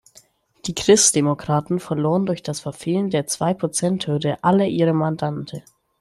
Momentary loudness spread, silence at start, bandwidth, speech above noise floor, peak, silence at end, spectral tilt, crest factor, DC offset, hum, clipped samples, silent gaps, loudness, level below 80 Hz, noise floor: 13 LU; 0.65 s; 13 kHz; 34 dB; 0 dBFS; 0.4 s; -4.5 dB/octave; 20 dB; under 0.1%; none; under 0.1%; none; -20 LUFS; -56 dBFS; -54 dBFS